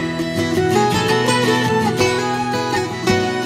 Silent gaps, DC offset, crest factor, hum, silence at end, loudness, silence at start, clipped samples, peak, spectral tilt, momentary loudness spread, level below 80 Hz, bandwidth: none; under 0.1%; 16 dB; none; 0 s; -17 LUFS; 0 s; under 0.1%; -2 dBFS; -4.5 dB/octave; 4 LU; -46 dBFS; 16 kHz